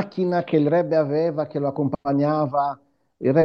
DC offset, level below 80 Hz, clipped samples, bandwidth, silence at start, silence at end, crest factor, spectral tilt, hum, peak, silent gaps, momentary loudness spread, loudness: under 0.1%; -62 dBFS; under 0.1%; 6 kHz; 0 s; 0 s; 16 dB; -10 dB/octave; none; -6 dBFS; none; 6 LU; -22 LUFS